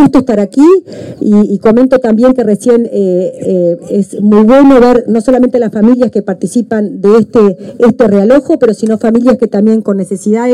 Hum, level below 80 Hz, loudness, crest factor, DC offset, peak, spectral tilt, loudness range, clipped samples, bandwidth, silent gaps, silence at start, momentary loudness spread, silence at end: none; -40 dBFS; -8 LUFS; 8 dB; under 0.1%; 0 dBFS; -7.5 dB/octave; 1 LU; 0.9%; 11.5 kHz; none; 0 s; 7 LU; 0 s